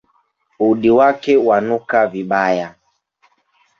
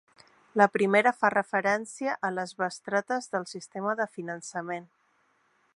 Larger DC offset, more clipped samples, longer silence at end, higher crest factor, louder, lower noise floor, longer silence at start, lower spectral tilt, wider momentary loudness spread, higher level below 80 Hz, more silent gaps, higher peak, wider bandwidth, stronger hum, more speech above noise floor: neither; neither; first, 1.1 s vs 0.9 s; second, 14 dB vs 24 dB; first, -15 LUFS vs -28 LUFS; second, -62 dBFS vs -69 dBFS; about the same, 0.6 s vs 0.55 s; first, -7 dB/octave vs -4.5 dB/octave; second, 7 LU vs 13 LU; first, -58 dBFS vs -76 dBFS; neither; first, -2 dBFS vs -6 dBFS; second, 7 kHz vs 11.5 kHz; neither; first, 47 dB vs 41 dB